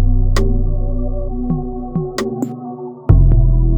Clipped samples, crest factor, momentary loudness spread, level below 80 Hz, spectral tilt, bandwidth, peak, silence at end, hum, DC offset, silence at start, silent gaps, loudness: under 0.1%; 14 dB; 11 LU; -16 dBFS; -8 dB/octave; 8.6 kHz; 0 dBFS; 0 s; none; under 0.1%; 0 s; none; -18 LUFS